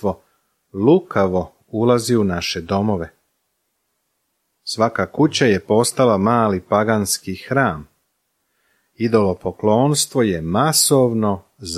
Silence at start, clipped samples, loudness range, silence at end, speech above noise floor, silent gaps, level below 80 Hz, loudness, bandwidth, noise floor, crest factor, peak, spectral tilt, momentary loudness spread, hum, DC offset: 0 s; under 0.1%; 4 LU; 0 s; 54 dB; none; -50 dBFS; -18 LUFS; 15 kHz; -71 dBFS; 18 dB; -2 dBFS; -4.5 dB/octave; 10 LU; none; under 0.1%